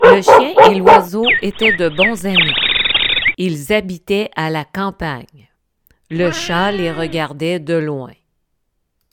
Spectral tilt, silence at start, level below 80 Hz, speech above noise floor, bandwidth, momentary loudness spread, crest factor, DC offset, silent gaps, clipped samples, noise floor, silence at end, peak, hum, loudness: -4.5 dB/octave; 0 s; -44 dBFS; 53 dB; 18.5 kHz; 13 LU; 14 dB; under 0.1%; none; 0.5%; -68 dBFS; 1 s; 0 dBFS; none; -13 LUFS